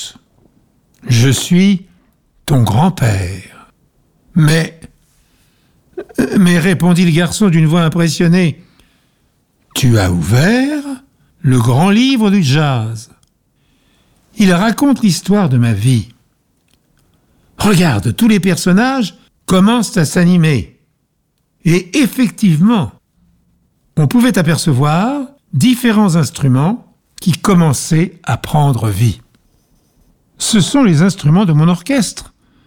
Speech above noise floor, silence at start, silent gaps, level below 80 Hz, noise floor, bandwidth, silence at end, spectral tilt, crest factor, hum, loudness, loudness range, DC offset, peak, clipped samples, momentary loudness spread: 52 dB; 0 s; none; -40 dBFS; -63 dBFS; 18 kHz; 0.4 s; -6 dB/octave; 12 dB; none; -12 LUFS; 3 LU; under 0.1%; -2 dBFS; under 0.1%; 12 LU